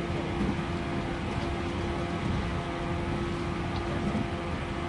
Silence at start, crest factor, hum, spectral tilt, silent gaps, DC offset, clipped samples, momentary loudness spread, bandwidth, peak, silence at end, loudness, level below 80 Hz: 0 s; 14 dB; none; -6.5 dB/octave; none; under 0.1%; under 0.1%; 2 LU; 11.5 kHz; -18 dBFS; 0 s; -32 LUFS; -40 dBFS